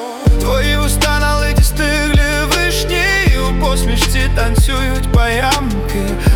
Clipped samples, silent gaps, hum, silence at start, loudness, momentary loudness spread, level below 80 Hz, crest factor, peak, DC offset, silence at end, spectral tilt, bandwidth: under 0.1%; none; none; 0 s; -14 LUFS; 3 LU; -16 dBFS; 10 dB; -2 dBFS; under 0.1%; 0 s; -4.5 dB/octave; 18 kHz